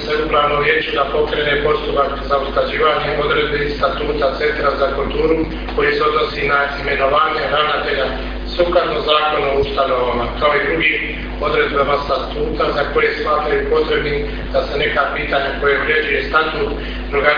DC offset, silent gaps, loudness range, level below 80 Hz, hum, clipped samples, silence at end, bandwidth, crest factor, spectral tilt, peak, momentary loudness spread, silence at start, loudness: under 0.1%; none; 1 LU; -30 dBFS; none; under 0.1%; 0 s; 5.2 kHz; 16 dB; -6.5 dB/octave; 0 dBFS; 5 LU; 0 s; -16 LUFS